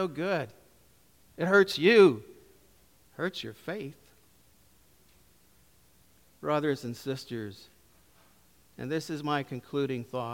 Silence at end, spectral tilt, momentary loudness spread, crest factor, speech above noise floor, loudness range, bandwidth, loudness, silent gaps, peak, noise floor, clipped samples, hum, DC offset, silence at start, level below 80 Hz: 0 s; -5.5 dB/octave; 18 LU; 24 dB; 35 dB; 15 LU; 17 kHz; -28 LUFS; none; -8 dBFS; -63 dBFS; under 0.1%; none; under 0.1%; 0 s; -70 dBFS